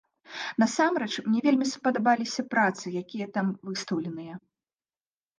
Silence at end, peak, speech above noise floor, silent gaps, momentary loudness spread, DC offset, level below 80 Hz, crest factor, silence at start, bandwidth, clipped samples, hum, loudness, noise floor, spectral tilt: 1 s; -10 dBFS; over 63 dB; none; 13 LU; under 0.1%; -78 dBFS; 18 dB; 0.3 s; 9.8 kHz; under 0.1%; none; -27 LUFS; under -90 dBFS; -4.5 dB/octave